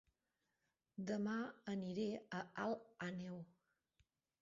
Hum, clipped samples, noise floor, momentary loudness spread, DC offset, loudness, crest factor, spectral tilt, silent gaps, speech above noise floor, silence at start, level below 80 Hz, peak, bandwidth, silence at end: none; under 0.1%; -89 dBFS; 10 LU; under 0.1%; -46 LUFS; 18 dB; -5.5 dB/octave; none; 44 dB; 0.95 s; -84 dBFS; -30 dBFS; 7.4 kHz; 0.95 s